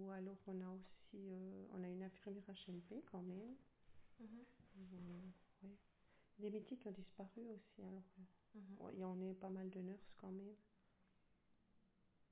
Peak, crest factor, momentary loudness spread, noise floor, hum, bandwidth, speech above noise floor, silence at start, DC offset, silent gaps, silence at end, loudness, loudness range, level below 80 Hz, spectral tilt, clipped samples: -40 dBFS; 16 dB; 13 LU; -79 dBFS; none; 4 kHz; 25 dB; 0 s; under 0.1%; none; 0.05 s; -55 LUFS; 4 LU; -84 dBFS; -7.5 dB/octave; under 0.1%